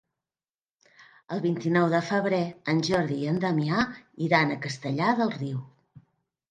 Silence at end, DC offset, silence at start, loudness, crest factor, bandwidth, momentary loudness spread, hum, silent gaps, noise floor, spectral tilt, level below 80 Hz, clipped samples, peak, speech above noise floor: 0.5 s; under 0.1%; 1.3 s; -26 LUFS; 20 dB; 10.5 kHz; 9 LU; none; none; under -90 dBFS; -6.5 dB/octave; -64 dBFS; under 0.1%; -8 dBFS; over 64 dB